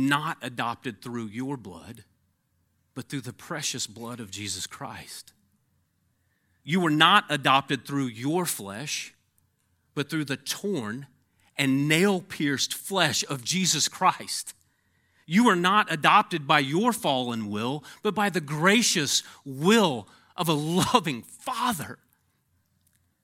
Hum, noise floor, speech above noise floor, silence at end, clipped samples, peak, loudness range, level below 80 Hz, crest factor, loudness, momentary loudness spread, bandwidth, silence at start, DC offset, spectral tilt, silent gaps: none; -71 dBFS; 46 dB; 1.3 s; under 0.1%; -2 dBFS; 12 LU; -70 dBFS; 24 dB; -25 LUFS; 17 LU; 17 kHz; 0 s; under 0.1%; -3.5 dB/octave; none